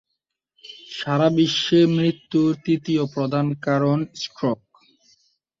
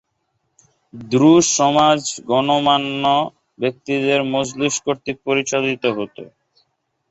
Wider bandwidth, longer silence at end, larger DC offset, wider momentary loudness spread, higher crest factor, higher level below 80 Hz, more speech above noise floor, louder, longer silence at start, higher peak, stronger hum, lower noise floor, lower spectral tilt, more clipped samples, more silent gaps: about the same, 7.6 kHz vs 8.2 kHz; first, 1.05 s vs 0.85 s; neither; first, 14 LU vs 11 LU; about the same, 16 dB vs 16 dB; about the same, -62 dBFS vs -58 dBFS; first, 59 dB vs 53 dB; second, -21 LUFS vs -17 LUFS; second, 0.65 s vs 0.95 s; second, -6 dBFS vs -2 dBFS; neither; first, -79 dBFS vs -70 dBFS; first, -6.5 dB/octave vs -3.5 dB/octave; neither; neither